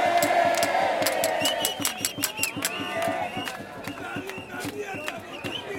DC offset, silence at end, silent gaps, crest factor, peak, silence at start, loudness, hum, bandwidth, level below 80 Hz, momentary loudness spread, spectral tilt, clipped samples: under 0.1%; 0 s; none; 20 dB; -6 dBFS; 0 s; -26 LUFS; none; 17 kHz; -64 dBFS; 12 LU; -2 dB/octave; under 0.1%